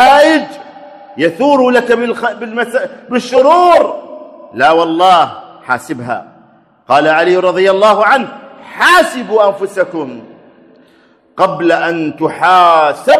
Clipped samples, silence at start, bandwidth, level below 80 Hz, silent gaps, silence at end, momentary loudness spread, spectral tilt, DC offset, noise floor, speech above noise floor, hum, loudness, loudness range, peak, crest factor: 0.5%; 0 s; 14 kHz; -56 dBFS; none; 0 s; 18 LU; -4 dB/octave; under 0.1%; -48 dBFS; 38 dB; none; -11 LUFS; 4 LU; 0 dBFS; 12 dB